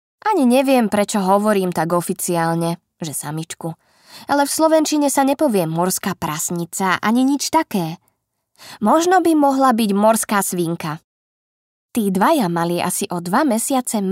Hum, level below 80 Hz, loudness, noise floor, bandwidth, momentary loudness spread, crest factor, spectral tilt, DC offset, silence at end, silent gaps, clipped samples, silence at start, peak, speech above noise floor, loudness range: none; -62 dBFS; -18 LUFS; -67 dBFS; 16.5 kHz; 11 LU; 16 dB; -4.5 dB/octave; under 0.1%; 0 s; 11.04-11.89 s; under 0.1%; 0.25 s; -2 dBFS; 50 dB; 3 LU